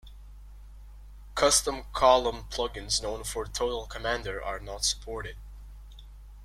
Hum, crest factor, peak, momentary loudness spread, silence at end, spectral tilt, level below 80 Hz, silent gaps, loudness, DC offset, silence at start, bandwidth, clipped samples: 50 Hz at -45 dBFS; 24 dB; -8 dBFS; 17 LU; 0 s; -2 dB/octave; -44 dBFS; none; -28 LUFS; under 0.1%; 0.05 s; 16 kHz; under 0.1%